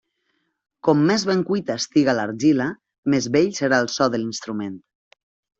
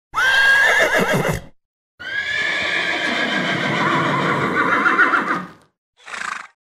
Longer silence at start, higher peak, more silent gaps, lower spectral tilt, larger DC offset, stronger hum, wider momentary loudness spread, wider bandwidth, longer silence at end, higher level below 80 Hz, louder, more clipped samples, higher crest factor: first, 0.85 s vs 0.15 s; about the same, -4 dBFS vs -4 dBFS; second, 2.98-3.03 s vs 1.65-1.98 s, 5.78-5.93 s; first, -5 dB/octave vs -3.5 dB/octave; neither; neither; second, 10 LU vs 15 LU; second, 8 kHz vs 16 kHz; first, 0.8 s vs 0.15 s; second, -62 dBFS vs -48 dBFS; second, -21 LUFS vs -17 LUFS; neither; about the same, 18 dB vs 16 dB